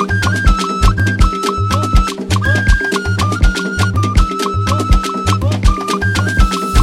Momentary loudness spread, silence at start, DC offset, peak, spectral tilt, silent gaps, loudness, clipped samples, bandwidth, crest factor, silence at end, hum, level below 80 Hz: 2 LU; 0 s; under 0.1%; 0 dBFS; -5 dB/octave; none; -15 LUFS; under 0.1%; 14.5 kHz; 12 dB; 0 s; none; -16 dBFS